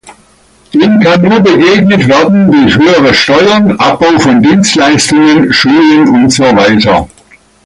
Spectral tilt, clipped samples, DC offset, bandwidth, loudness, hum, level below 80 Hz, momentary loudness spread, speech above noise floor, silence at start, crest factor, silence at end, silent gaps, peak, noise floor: -5 dB/octave; under 0.1%; under 0.1%; 11.5 kHz; -5 LUFS; none; -36 dBFS; 3 LU; 38 dB; 0.05 s; 6 dB; 0.6 s; none; 0 dBFS; -43 dBFS